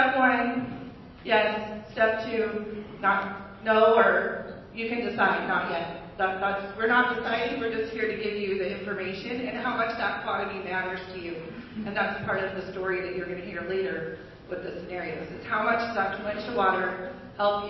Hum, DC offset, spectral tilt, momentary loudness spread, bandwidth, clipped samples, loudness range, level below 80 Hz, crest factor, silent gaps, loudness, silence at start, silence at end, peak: none; under 0.1%; -7 dB/octave; 14 LU; 6 kHz; under 0.1%; 6 LU; -56 dBFS; 22 dB; none; -27 LUFS; 0 s; 0 s; -6 dBFS